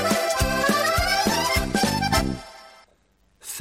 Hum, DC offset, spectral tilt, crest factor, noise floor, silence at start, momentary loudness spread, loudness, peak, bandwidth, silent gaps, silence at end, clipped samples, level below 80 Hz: none; under 0.1%; -3.5 dB/octave; 16 dB; -63 dBFS; 0 s; 15 LU; -22 LUFS; -8 dBFS; 16.5 kHz; none; 0 s; under 0.1%; -36 dBFS